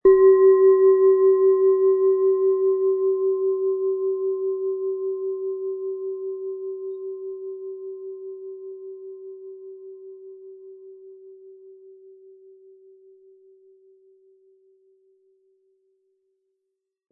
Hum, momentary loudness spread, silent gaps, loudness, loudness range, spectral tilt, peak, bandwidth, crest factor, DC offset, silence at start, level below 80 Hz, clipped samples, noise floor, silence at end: none; 25 LU; none; -20 LUFS; 25 LU; -11 dB/octave; -6 dBFS; 2 kHz; 16 dB; under 0.1%; 0.05 s; -64 dBFS; under 0.1%; -81 dBFS; 5.4 s